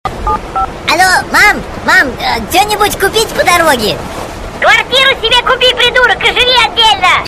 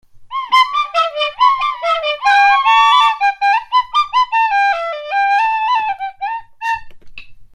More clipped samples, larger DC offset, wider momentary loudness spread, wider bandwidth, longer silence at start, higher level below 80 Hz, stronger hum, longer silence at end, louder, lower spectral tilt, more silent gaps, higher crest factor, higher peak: first, 0.5% vs under 0.1%; neither; second, 9 LU vs 13 LU; first, 16 kHz vs 12.5 kHz; about the same, 0.05 s vs 0.15 s; first, -30 dBFS vs -52 dBFS; neither; about the same, 0 s vs 0.1 s; first, -8 LUFS vs -14 LUFS; first, -2 dB/octave vs 1 dB/octave; neither; about the same, 10 dB vs 14 dB; about the same, 0 dBFS vs 0 dBFS